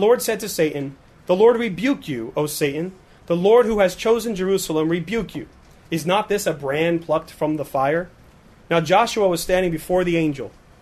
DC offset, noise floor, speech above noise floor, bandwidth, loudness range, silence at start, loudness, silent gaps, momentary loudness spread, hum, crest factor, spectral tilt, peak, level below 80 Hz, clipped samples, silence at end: under 0.1%; -49 dBFS; 29 dB; 13.5 kHz; 3 LU; 0 s; -20 LUFS; none; 13 LU; none; 16 dB; -5 dB/octave; -4 dBFS; -48 dBFS; under 0.1%; 0.3 s